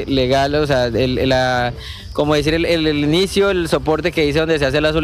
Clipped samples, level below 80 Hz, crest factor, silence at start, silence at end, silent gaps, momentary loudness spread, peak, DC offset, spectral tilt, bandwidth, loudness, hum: under 0.1%; -32 dBFS; 12 dB; 0 s; 0 s; none; 3 LU; -4 dBFS; under 0.1%; -5.5 dB/octave; 15.5 kHz; -16 LUFS; none